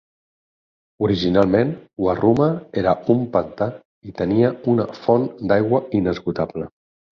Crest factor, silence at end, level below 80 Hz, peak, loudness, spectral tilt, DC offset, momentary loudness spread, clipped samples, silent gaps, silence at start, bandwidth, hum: 18 dB; 0.45 s; -48 dBFS; -2 dBFS; -20 LUFS; -8.5 dB/octave; under 0.1%; 9 LU; under 0.1%; 3.85-4.02 s; 1 s; 6.8 kHz; none